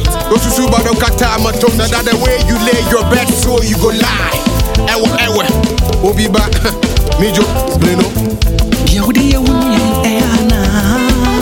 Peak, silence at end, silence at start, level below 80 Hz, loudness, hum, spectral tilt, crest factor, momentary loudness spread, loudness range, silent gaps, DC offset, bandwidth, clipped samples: 0 dBFS; 0 s; 0 s; -16 dBFS; -11 LUFS; none; -4.5 dB/octave; 10 dB; 2 LU; 1 LU; none; under 0.1%; 17.5 kHz; under 0.1%